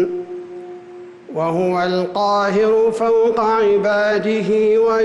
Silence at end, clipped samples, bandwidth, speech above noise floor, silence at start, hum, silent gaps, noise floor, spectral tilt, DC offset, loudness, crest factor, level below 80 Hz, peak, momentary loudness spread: 0 s; under 0.1%; 11 kHz; 22 dB; 0 s; none; none; -37 dBFS; -6 dB/octave; under 0.1%; -16 LUFS; 8 dB; -56 dBFS; -8 dBFS; 19 LU